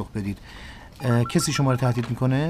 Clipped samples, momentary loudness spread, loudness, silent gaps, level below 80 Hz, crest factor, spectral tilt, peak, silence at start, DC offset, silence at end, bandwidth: under 0.1%; 19 LU; -24 LUFS; none; -46 dBFS; 14 dB; -6 dB/octave; -8 dBFS; 0 s; 0.1%; 0 s; 15.5 kHz